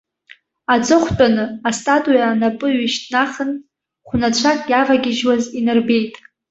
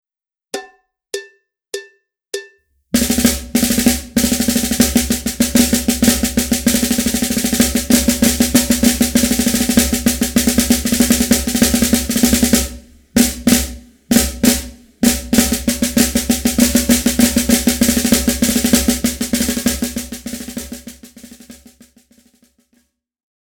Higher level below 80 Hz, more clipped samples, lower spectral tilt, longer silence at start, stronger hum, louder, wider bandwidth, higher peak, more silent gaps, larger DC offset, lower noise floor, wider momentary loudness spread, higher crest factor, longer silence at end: second, -46 dBFS vs -30 dBFS; neither; about the same, -4 dB/octave vs -3 dB/octave; first, 0.7 s vs 0.55 s; neither; second, -17 LUFS vs -14 LUFS; second, 8 kHz vs over 20 kHz; about the same, -2 dBFS vs 0 dBFS; neither; neither; second, -48 dBFS vs -86 dBFS; second, 8 LU vs 15 LU; about the same, 16 dB vs 16 dB; second, 0.4 s vs 2 s